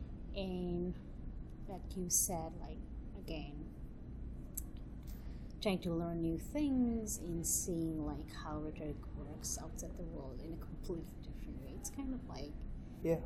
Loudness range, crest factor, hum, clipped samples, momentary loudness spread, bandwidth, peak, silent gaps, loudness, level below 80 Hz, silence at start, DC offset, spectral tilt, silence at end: 8 LU; 22 dB; none; under 0.1%; 15 LU; 16.5 kHz; -20 dBFS; none; -42 LUFS; -48 dBFS; 0 s; under 0.1%; -4.5 dB/octave; 0 s